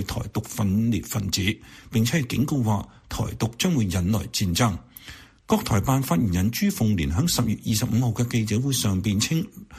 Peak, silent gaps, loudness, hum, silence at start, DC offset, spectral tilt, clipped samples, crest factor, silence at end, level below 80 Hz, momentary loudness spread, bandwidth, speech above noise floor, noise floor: -6 dBFS; none; -24 LUFS; none; 0 s; under 0.1%; -5 dB/octave; under 0.1%; 18 dB; 0 s; -42 dBFS; 7 LU; 15.5 kHz; 22 dB; -45 dBFS